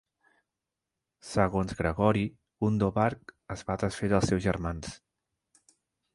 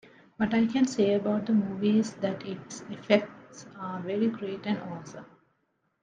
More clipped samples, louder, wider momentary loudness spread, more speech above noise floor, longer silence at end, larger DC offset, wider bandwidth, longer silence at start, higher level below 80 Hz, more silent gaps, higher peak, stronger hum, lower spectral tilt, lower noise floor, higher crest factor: neither; about the same, -29 LUFS vs -28 LUFS; second, 13 LU vs 16 LU; first, 59 dB vs 47 dB; first, 1.2 s vs 0.75 s; neither; first, 11.5 kHz vs 9.2 kHz; first, 1.25 s vs 0.4 s; first, -48 dBFS vs -68 dBFS; neither; about the same, -8 dBFS vs -8 dBFS; neither; about the same, -6.5 dB/octave vs -6 dB/octave; first, -88 dBFS vs -75 dBFS; about the same, 22 dB vs 22 dB